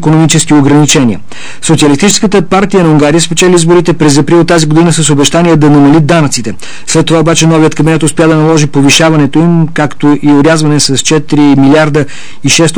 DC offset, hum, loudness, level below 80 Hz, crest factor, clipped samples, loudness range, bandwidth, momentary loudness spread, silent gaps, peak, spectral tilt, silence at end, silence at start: 10%; none; -6 LUFS; -34 dBFS; 6 dB; 1%; 1 LU; 11 kHz; 6 LU; none; 0 dBFS; -5 dB/octave; 0 s; 0 s